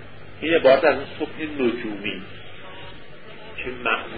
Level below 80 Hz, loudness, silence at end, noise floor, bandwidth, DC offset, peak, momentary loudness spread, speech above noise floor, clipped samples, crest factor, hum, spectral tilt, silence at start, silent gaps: -52 dBFS; -22 LUFS; 0 s; -42 dBFS; 4.9 kHz; 1%; -4 dBFS; 25 LU; 21 dB; under 0.1%; 20 dB; none; -9.5 dB/octave; 0 s; none